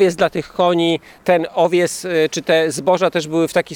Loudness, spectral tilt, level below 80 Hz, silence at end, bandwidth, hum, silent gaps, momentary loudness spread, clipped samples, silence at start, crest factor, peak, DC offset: -17 LUFS; -4.5 dB/octave; -56 dBFS; 0 s; 18 kHz; none; none; 3 LU; under 0.1%; 0 s; 14 dB; -2 dBFS; under 0.1%